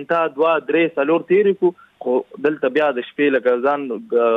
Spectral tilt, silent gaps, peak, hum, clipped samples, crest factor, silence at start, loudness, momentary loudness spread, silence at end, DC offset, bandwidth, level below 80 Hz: -7.5 dB/octave; none; -6 dBFS; none; under 0.1%; 12 dB; 0 s; -18 LUFS; 6 LU; 0 s; under 0.1%; 4.7 kHz; -72 dBFS